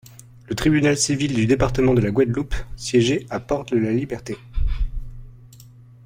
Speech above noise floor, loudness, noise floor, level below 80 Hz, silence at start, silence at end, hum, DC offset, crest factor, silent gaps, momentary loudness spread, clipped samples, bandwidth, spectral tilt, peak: 25 dB; -21 LUFS; -45 dBFS; -30 dBFS; 0.5 s; 0.4 s; none; under 0.1%; 18 dB; none; 13 LU; under 0.1%; 16.5 kHz; -5.5 dB/octave; -4 dBFS